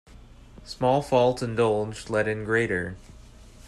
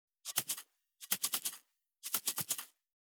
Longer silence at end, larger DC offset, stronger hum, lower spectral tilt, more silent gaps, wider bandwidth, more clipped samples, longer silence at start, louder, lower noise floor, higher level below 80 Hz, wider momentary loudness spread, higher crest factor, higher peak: second, 0 s vs 0.4 s; neither; neither; first, -6 dB/octave vs 0.5 dB/octave; neither; second, 12.5 kHz vs over 20 kHz; neither; second, 0.1 s vs 0.25 s; first, -25 LUFS vs -37 LUFS; second, -48 dBFS vs -62 dBFS; first, -50 dBFS vs under -90 dBFS; second, 11 LU vs 17 LU; second, 18 dB vs 26 dB; first, -10 dBFS vs -16 dBFS